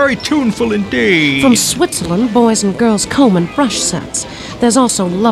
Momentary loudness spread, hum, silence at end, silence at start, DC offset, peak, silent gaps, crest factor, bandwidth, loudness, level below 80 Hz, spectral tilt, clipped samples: 6 LU; none; 0 s; 0 s; under 0.1%; 0 dBFS; none; 12 dB; 15.5 kHz; -12 LUFS; -40 dBFS; -4 dB/octave; under 0.1%